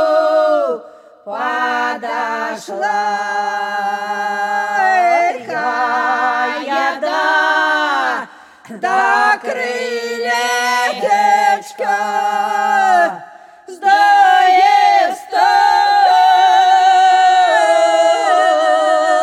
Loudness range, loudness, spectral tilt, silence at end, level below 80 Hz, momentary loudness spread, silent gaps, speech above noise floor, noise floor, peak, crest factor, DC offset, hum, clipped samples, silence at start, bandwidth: 7 LU; -14 LUFS; -1.5 dB/octave; 0 s; -72 dBFS; 10 LU; none; 20 dB; -38 dBFS; 0 dBFS; 12 dB; under 0.1%; none; under 0.1%; 0 s; 13 kHz